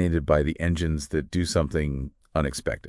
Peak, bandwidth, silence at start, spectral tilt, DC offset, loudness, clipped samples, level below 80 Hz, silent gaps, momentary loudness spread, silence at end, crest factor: -8 dBFS; 12 kHz; 0 s; -6 dB/octave; under 0.1%; -26 LUFS; under 0.1%; -36 dBFS; none; 7 LU; 0 s; 18 dB